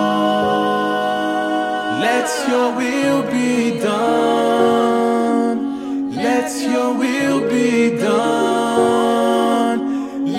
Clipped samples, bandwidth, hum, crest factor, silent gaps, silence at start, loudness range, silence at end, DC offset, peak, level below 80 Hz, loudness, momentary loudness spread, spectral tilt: under 0.1%; 15.5 kHz; none; 14 dB; none; 0 s; 1 LU; 0 s; under 0.1%; -2 dBFS; -58 dBFS; -17 LUFS; 5 LU; -4.5 dB/octave